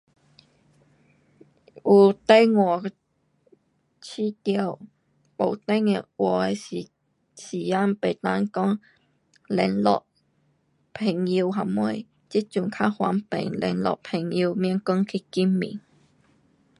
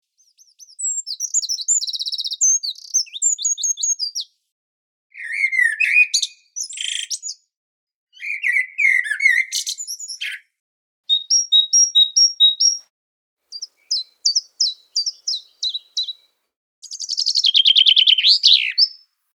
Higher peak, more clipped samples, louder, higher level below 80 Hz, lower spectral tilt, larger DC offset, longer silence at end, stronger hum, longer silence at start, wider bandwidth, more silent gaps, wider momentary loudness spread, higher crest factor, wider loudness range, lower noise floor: second, -4 dBFS vs 0 dBFS; neither; second, -24 LUFS vs -16 LUFS; first, -68 dBFS vs under -90 dBFS; first, -7 dB/octave vs 11 dB/octave; neither; first, 1 s vs 0.4 s; neither; first, 1.75 s vs 0.8 s; second, 11 kHz vs over 20 kHz; second, none vs 4.52-5.10 s, 7.57-7.87 s, 7.95-8.07 s, 10.60-11.04 s, 12.90-13.37 s, 16.57-16.82 s; about the same, 18 LU vs 17 LU; about the same, 22 dB vs 20 dB; second, 5 LU vs 8 LU; first, -67 dBFS vs -56 dBFS